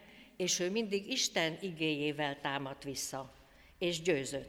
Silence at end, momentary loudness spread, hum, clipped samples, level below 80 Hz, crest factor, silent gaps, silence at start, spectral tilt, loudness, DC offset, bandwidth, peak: 0 s; 8 LU; none; under 0.1%; -68 dBFS; 18 dB; none; 0 s; -3 dB/octave; -35 LUFS; under 0.1%; 17 kHz; -18 dBFS